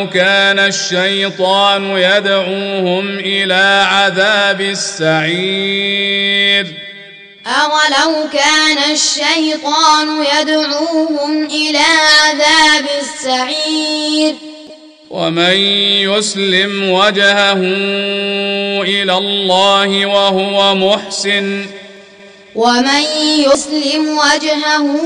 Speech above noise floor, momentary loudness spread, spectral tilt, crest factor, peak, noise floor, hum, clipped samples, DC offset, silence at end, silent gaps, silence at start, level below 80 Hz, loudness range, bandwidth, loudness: 26 dB; 7 LU; -2.5 dB/octave; 12 dB; 0 dBFS; -38 dBFS; none; under 0.1%; under 0.1%; 0 s; none; 0 s; -58 dBFS; 3 LU; 10.5 kHz; -11 LUFS